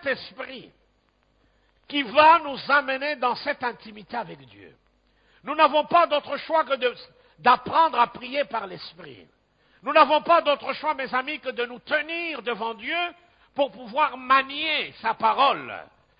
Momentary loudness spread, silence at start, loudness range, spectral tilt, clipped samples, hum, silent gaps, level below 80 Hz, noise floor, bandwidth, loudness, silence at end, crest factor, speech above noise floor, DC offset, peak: 18 LU; 0.05 s; 4 LU; -7 dB/octave; under 0.1%; none; none; -68 dBFS; -66 dBFS; 5.2 kHz; -23 LUFS; 0.35 s; 20 dB; 42 dB; under 0.1%; -4 dBFS